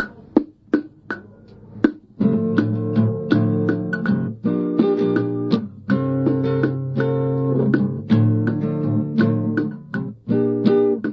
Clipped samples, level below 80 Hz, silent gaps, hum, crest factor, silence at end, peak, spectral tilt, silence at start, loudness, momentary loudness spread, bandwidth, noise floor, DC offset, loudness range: under 0.1%; -56 dBFS; none; none; 18 dB; 0 s; -2 dBFS; -10.5 dB/octave; 0 s; -20 LUFS; 6 LU; 5.8 kHz; -44 dBFS; under 0.1%; 2 LU